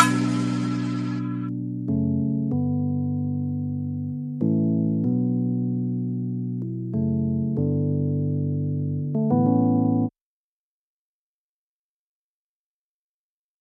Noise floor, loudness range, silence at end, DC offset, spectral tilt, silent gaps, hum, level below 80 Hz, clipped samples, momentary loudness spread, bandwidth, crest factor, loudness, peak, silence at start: under -90 dBFS; 3 LU; 3.5 s; under 0.1%; -7.5 dB/octave; none; none; -68 dBFS; under 0.1%; 8 LU; 12 kHz; 22 dB; -25 LUFS; -2 dBFS; 0 s